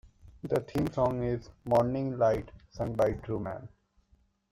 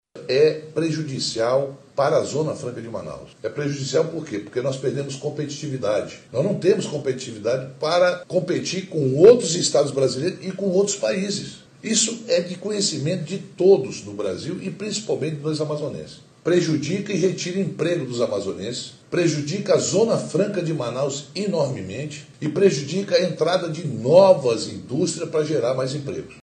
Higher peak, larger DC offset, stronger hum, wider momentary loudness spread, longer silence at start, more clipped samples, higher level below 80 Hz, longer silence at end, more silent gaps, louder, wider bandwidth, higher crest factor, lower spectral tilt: second, -14 dBFS vs -2 dBFS; neither; neither; about the same, 11 LU vs 11 LU; about the same, 0.05 s vs 0.15 s; neither; first, -52 dBFS vs -64 dBFS; first, 0.85 s vs 0.05 s; neither; second, -31 LUFS vs -22 LUFS; first, 16 kHz vs 9.8 kHz; about the same, 18 dB vs 20 dB; first, -8 dB/octave vs -5 dB/octave